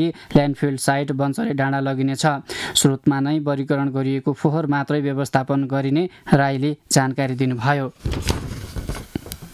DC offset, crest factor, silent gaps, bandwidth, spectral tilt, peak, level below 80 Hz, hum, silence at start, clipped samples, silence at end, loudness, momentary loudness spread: under 0.1%; 18 dB; none; 15 kHz; -5.5 dB/octave; -4 dBFS; -40 dBFS; none; 0 s; under 0.1%; 0 s; -21 LUFS; 9 LU